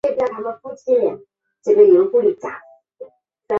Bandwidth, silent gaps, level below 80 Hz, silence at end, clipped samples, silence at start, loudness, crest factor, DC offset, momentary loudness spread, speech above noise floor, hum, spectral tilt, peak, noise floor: 7 kHz; none; -64 dBFS; 0 s; under 0.1%; 0.05 s; -16 LUFS; 16 dB; under 0.1%; 19 LU; 25 dB; none; -7.5 dB/octave; -2 dBFS; -41 dBFS